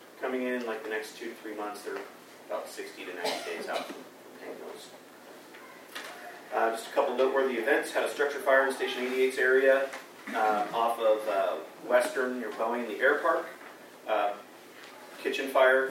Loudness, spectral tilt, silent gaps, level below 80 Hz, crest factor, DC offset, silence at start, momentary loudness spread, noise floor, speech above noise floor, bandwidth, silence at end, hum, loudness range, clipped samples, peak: -29 LUFS; -2.5 dB/octave; none; under -90 dBFS; 20 dB; under 0.1%; 0 s; 22 LU; -49 dBFS; 21 dB; 16 kHz; 0 s; none; 11 LU; under 0.1%; -10 dBFS